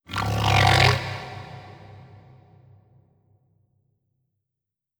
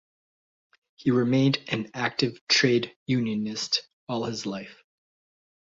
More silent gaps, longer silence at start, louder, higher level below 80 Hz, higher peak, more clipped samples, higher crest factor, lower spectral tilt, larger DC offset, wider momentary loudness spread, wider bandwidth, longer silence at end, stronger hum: second, none vs 2.41-2.47 s, 2.96-3.06 s, 3.93-4.07 s; second, 0.1 s vs 1 s; first, -20 LUFS vs -26 LUFS; first, -44 dBFS vs -66 dBFS; first, -2 dBFS vs -6 dBFS; neither; about the same, 24 dB vs 20 dB; about the same, -4.5 dB/octave vs -4.5 dB/octave; neither; first, 25 LU vs 11 LU; first, over 20 kHz vs 7.8 kHz; first, 3 s vs 1.05 s; neither